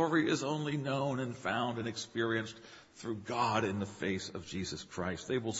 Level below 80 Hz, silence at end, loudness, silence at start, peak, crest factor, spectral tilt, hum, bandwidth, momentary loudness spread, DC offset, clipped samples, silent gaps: -66 dBFS; 0 s; -35 LUFS; 0 s; -16 dBFS; 20 dB; -5 dB/octave; none; 8 kHz; 10 LU; under 0.1%; under 0.1%; none